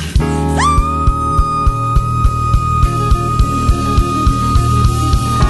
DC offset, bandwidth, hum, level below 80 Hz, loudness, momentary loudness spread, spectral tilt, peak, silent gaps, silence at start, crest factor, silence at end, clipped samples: under 0.1%; 12.5 kHz; none; -16 dBFS; -14 LUFS; 2 LU; -6 dB/octave; 0 dBFS; none; 0 s; 12 dB; 0 s; under 0.1%